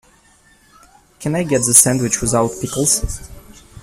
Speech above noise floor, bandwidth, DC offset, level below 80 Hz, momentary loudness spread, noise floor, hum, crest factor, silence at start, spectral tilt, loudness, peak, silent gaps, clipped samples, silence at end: 35 dB; 16 kHz; under 0.1%; -36 dBFS; 17 LU; -52 dBFS; none; 18 dB; 1.2 s; -3.5 dB/octave; -14 LUFS; 0 dBFS; none; under 0.1%; 0 s